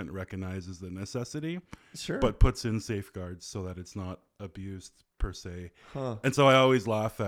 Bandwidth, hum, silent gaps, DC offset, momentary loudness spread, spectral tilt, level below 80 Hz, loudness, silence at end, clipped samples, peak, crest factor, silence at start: 16 kHz; none; none; under 0.1%; 20 LU; -5.5 dB/octave; -38 dBFS; -30 LUFS; 0 s; under 0.1%; -8 dBFS; 22 dB; 0 s